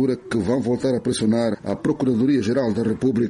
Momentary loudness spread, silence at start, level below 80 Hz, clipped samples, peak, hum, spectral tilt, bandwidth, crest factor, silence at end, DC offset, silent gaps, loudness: 5 LU; 0 s; -52 dBFS; under 0.1%; -10 dBFS; none; -6.5 dB/octave; 11.5 kHz; 12 dB; 0 s; under 0.1%; none; -21 LUFS